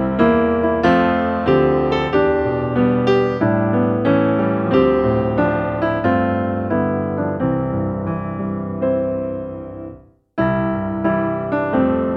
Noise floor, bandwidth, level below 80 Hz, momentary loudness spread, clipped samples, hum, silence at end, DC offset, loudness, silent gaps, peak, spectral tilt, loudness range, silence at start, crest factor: -40 dBFS; 6.6 kHz; -40 dBFS; 9 LU; under 0.1%; none; 0 s; under 0.1%; -18 LUFS; none; -2 dBFS; -9 dB/octave; 6 LU; 0 s; 16 dB